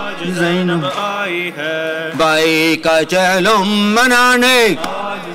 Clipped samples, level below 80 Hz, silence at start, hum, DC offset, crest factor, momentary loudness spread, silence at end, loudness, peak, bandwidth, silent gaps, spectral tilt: under 0.1%; -48 dBFS; 0 s; none; under 0.1%; 10 dB; 10 LU; 0 s; -13 LUFS; -4 dBFS; 16 kHz; none; -3.5 dB/octave